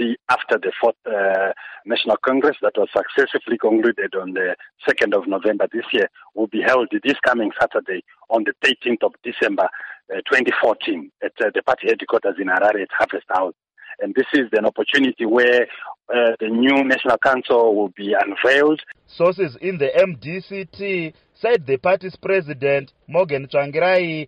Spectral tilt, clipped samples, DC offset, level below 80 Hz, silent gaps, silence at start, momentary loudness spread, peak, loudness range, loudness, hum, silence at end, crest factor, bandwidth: -5.5 dB/octave; under 0.1%; under 0.1%; -62 dBFS; none; 0 s; 9 LU; -4 dBFS; 3 LU; -19 LUFS; none; 0 s; 14 dB; 10 kHz